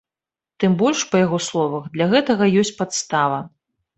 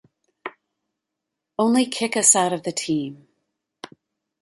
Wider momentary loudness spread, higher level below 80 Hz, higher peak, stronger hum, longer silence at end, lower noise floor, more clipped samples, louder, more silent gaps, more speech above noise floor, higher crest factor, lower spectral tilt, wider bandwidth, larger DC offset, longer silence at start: second, 7 LU vs 23 LU; first, -60 dBFS vs -72 dBFS; about the same, -4 dBFS vs -2 dBFS; neither; about the same, 0.5 s vs 0.55 s; first, -90 dBFS vs -83 dBFS; neither; about the same, -19 LUFS vs -19 LUFS; neither; first, 71 dB vs 62 dB; second, 16 dB vs 24 dB; first, -5 dB/octave vs -2.5 dB/octave; second, 8.4 kHz vs 12 kHz; neither; first, 0.6 s vs 0.45 s